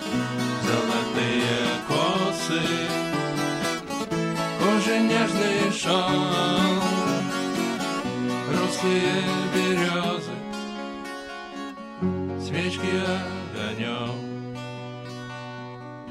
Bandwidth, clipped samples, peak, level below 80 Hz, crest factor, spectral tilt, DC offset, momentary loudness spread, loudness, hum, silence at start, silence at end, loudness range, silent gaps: 15.5 kHz; under 0.1%; -8 dBFS; -58 dBFS; 18 dB; -4.5 dB/octave; under 0.1%; 14 LU; -25 LUFS; none; 0 s; 0 s; 7 LU; none